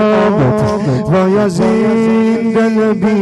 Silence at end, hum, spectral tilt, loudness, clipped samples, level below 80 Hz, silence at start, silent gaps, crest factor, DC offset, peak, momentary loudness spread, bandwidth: 0 s; none; -7.5 dB/octave; -12 LUFS; under 0.1%; -42 dBFS; 0 s; none; 8 dB; under 0.1%; -2 dBFS; 2 LU; 11 kHz